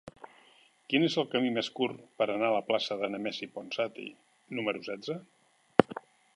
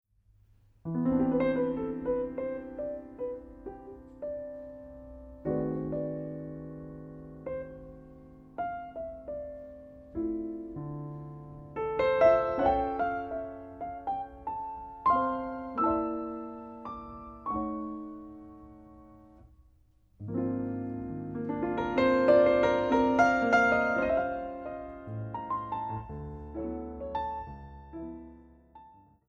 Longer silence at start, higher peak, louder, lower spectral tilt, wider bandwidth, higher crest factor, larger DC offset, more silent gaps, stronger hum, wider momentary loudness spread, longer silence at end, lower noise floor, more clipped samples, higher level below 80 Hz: second, 0.05 s vs 0.85 s; first, -2 dBFS vs -10 dBFS; about the same, -31 LUFS vs -31 LUFS; second, -5.5 dB/octave vs -7.5 dB/octave; first, 11.5 kHz vs 7.2 kHz; first, 32 dB vs 22 dB; neither; neither; neither; second, 13 LU vs 22 LU; about the same, 0.35 s vs 0.35 s; about the same, -62 dBFS vs -64 dBFS; neither; second, -72 dBFS vs -54 dBFS